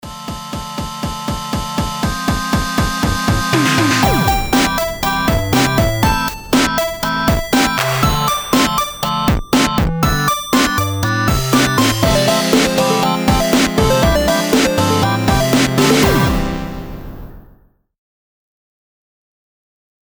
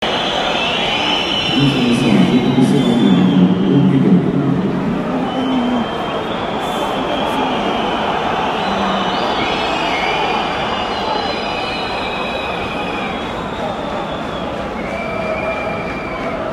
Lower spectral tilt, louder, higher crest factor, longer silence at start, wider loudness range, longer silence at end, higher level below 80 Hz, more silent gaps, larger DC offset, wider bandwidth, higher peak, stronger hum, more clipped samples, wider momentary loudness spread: second, -4.5 dB/octave vs -6 dB/octave; about the same, -15 LUFS vs -16 LUFS; about the same, 14 dB vs 16 dB; about the same, 0.05 s vs 0 s; second, 5 LU vs 8 LU; first, 2.65 s vs 0 s; first, -26 dBFS vs -40 dBFS; neither; neither; first, over 20 kHz vs 12.5 kHz; about the same, 0 dBFS vs 0 dBFS; neither; neither; about the same, 10 LU vs 9 LU